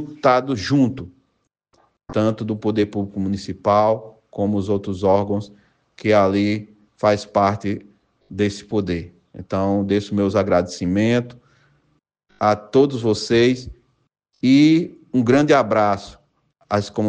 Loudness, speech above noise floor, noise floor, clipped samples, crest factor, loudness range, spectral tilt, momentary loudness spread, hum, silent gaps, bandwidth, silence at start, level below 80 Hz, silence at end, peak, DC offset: -19 LUFS; 52 dB; -70 dBFS; under 0.1%; 16 dB; 5 LU; -6.5 dB/octave; 11 LU; none; none; 9.4 kHz; 0 s; -52 dBFS; 0 s; -4 dBFS; under 0.1%